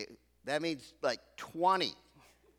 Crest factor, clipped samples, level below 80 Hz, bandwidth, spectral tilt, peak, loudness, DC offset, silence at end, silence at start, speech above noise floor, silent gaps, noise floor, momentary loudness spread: 20 dB; under 0.1%; -74 dBFS; 17.5 kHz; -4 dB/octave; -16 dBFS; -34 LUFS; under 0.1%; 0.65 s; 0 s; 30 dB; none; -64 dBFS; 16 LU